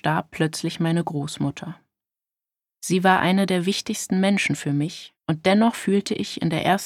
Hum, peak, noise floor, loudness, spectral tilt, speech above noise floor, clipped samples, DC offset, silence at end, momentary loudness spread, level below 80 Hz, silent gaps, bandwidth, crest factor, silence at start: none; -4 dBFS; -90 dBFS; -22 LUFS; -5 dB/octave; 68 dB; under 0.1%; under 0.1%; 0 s; 10 LU; -60 dBFS; none; 15 kHz; 20 dB; 0.05 s